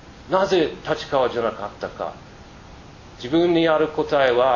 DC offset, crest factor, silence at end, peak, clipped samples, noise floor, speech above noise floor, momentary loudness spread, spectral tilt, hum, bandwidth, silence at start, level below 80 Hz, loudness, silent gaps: under 0.1%; 18 dB; 0 s; -4 dBFS; under 0.1%; -42 dBFS; 22 dB; 14 LU; -6 dB/octave; none; 7.4 kHz; 0.05 s; -50 dBFS; -21 LUFS; none